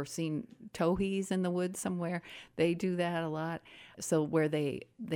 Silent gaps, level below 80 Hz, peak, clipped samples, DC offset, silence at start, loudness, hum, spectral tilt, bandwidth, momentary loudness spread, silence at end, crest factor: none; -62 dBFS; -18 dBFS; under 0.1%; under 0.1%; 0 s; -34 LUFS; none; -6 dB/octave; 17.5 kHz; 12 LU; 0 s; 16 dB